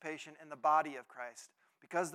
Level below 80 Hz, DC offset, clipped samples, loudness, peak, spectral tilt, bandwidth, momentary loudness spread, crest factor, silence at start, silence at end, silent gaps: under -90 dBFS; under 0.1%; under 0.1%; -37 LUFS; -18 dBFS; -3.5 dB/octave; 14.5 kHz; 17 LU; 20 dB; 0 s; 0 s; none